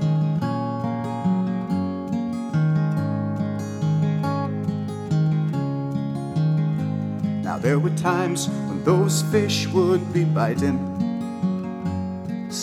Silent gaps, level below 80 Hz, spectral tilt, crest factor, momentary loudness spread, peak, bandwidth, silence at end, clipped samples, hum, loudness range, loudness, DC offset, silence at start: none; -58 dBFS; -6.5 dB/octave; 16 dB; 6 LU; -6 dBFS; 14 kHz; 0 s; under 0.1%; none; 3 LU; -23 LUFS; under 0.1%; 0 s